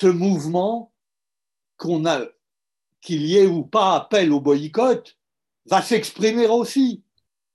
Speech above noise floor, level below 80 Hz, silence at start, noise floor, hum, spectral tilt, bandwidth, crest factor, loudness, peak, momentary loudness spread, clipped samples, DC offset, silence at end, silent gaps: 70 dB; -70 dBFS; 0 s; -89 dBFS; none; -5.5 dB/octave; 12.5 kHz; 16 dB; -20 LUFS; -6 dBFS; 8 LU; under 0.1%; under 0.1%; 0.6 s; none